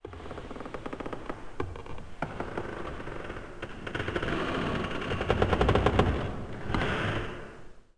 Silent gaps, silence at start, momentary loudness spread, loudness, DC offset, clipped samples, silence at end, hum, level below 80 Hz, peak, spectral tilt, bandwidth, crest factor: none; 0.05 s; 16 LU; -32 LUFS; 0.1%; under 0.1%; 0.15 s; none; -40 dBFS; -6 dBFS; -6.5 dB/octave; 10.5 kHz; 26 dB